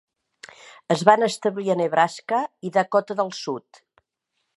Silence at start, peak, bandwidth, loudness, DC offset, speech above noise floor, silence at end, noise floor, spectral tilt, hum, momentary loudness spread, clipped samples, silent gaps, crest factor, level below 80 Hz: 0.9 s; 0 dBFS; 11.5 kHz; -22 LUFS; under 0.1%; 55 dB; 1 s; -77 dBFS; -5 dB/octave; none; 13 LU; under 0.1%; none; 24 dB; -70 dBFS